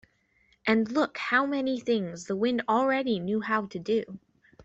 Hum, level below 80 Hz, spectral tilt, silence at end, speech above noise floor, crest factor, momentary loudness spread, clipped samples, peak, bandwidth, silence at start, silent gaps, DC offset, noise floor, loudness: none; -68 dBFS; -5.5 dB/octave; 0 s; 40 dB; 16 dB; 6 LU; under 0.1%; -12 dBFS; 8 kHz; 0.65 s; none; under 0.1%; -67 dBFS; -28 LUFS